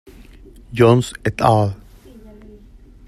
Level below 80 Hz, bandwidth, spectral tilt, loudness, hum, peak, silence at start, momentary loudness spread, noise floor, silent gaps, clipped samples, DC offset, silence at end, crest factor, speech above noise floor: -44 dBFS; 13.5 kHz; -7 dB/octave; -16 LUFS; none; -2 dBFS; 0.7 s; 15 LU; -44 dBFS; none; under 0.1%; under 0.1%; 1.35 s; 18 dB; 28 dB